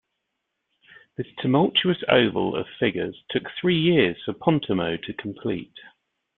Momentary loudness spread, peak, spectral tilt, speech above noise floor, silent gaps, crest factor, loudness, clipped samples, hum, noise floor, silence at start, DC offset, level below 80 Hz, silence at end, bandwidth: 13 LU; -2 dBFS; -10 dB/octave; 56 dB; none; 22 dB; -23 LUFS; under 0.1%; none; -79 dBFS; 1.2 s; under 0.1%; -60 dBFS; 0.5 s; 4.2 kHz